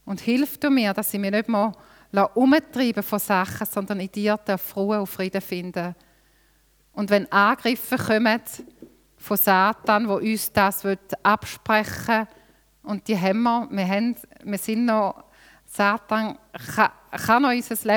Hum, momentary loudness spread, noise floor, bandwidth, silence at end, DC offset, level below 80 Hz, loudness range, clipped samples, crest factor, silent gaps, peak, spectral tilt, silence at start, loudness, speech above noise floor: none; 12 LU; -61 dBFS; over 20 kHz; 0 s; under 0.1%; -60 dBFS; 4 LU; under 0.1%; 20 dB; none; -4 dBFS; -5 dB/octave; 0.05 s; -23 LUFS; 38 dB